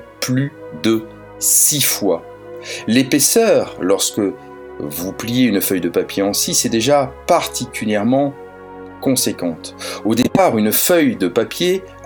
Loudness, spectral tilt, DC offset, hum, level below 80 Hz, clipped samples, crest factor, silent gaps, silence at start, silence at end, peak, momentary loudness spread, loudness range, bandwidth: -16 LUFS; -3.5 dB/octave; under 0.1%; none; -50 dBFS; under 0.1%; 18 dB; none; 0 s; 0 s; 0 dBFS; 15 LU; 3 LU; over 20 kHz